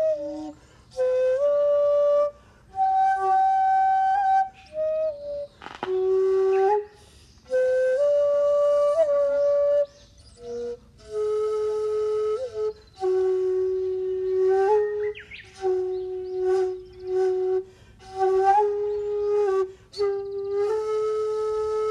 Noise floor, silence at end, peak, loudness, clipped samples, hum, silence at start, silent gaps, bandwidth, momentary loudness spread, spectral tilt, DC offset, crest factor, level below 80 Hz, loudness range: -52 dBFS; 0 s; -10 dBFS; -24 LUFS; under 0.1%; none; 0 s; none; 10 kHz; 13 LU; -5.5 dB/octave; under 0.1%; 14 dB; -58 dBFS; 4 LU